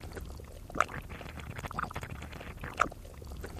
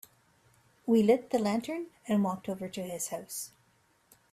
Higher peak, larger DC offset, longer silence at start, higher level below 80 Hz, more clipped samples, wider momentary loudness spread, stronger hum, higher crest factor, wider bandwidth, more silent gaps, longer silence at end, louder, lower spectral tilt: first, -8 dBFS vs -14 dBFS; neither; second, 0 s vs 0.85 s; first, -48 dBFS vs -72 dBFS; neither; about the same, 13 LU vs 14 LU; neither; first, 30 dB vs 18 dB; about the same, 15.5 kHz vs 16 kHz; neither; second, 0 s vs 0.85 s; second, -38 LUFS vs -31 LUFS; about the same, -4.5 dB/octave vs -5.5 dB/octave